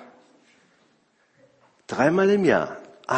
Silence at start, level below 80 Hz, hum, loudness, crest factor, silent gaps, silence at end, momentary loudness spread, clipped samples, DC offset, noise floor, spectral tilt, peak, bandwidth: 0 s; -64 dBFS; none; -21 LUFS; 20 dB; none; 0 s; 15 LU; under 0.1%; under 0.1%; -64 dBFS; -6.5 dB/octave; -4 dBFS; 8.6 kHz